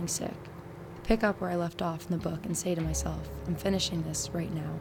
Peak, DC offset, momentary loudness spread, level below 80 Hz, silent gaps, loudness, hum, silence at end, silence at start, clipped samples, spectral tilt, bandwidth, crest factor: -10 dBFS; under 0.1%; 13 LU; -44 dBFS; none; -32 LUFS; none; 0 s; 0 s; under 0.1%; -4.5 dB/octave; 18.5 kHz; 22 dB